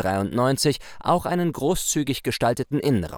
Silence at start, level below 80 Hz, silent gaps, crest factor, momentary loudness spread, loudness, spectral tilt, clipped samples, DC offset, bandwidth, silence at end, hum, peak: 0 s; -46 dBFS; none; 16 dB; 3 LU; -23 LUFS; -5 dB/octave; under 0.1%; under 0.1%; over 20 kHz; 0 s; none; -8 dBFS